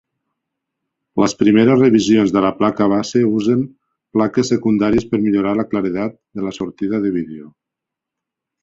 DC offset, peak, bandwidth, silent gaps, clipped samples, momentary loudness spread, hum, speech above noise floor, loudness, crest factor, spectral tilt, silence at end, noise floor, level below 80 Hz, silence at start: under 0.1%; -2 dBFS; 7.8 kHz; none; under 0.1%; 13 LU; none; 68 dB; -16 LUFS; 16 dB; -6.5 dB/octave; 1.15 s; -83 dBFS; -50 dBFS; 1.15 s